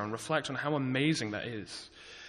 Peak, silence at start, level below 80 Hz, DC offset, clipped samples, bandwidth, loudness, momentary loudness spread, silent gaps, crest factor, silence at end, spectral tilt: -14 dBFS; 0 s; -68 dBFS; under 0.1%; under 0.1%; 12 kHz; -33 LUFS; 15 LU; none; 20 dB; 0 s; -5 dB/octave